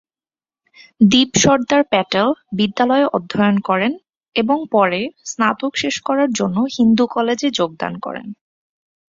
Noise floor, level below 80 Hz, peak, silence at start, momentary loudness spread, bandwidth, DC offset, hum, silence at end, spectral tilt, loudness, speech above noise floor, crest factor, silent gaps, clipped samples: under -90 dBFS; -54 dBFS; 0 dBFS; 1 s; 11 LU; 7.6 kHz; under 0.1%; none; 0.75 s; -4 dB/octave; -17 LUFS; over 74 dB; 16 dB; 4.17-4.21 s; under 0.1%